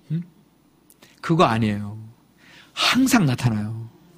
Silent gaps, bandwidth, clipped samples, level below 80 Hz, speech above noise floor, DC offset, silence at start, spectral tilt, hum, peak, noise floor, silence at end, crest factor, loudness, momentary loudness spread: none; 15.5 kHz; under 0.1%; -52 dBFS; 37 dB; under 0.1%; 0.1 s; -5 dB/octave; none; -2 dBFS; -57 dBFS; 0.3 s; 20 dB; -21 LUFS; 18 LU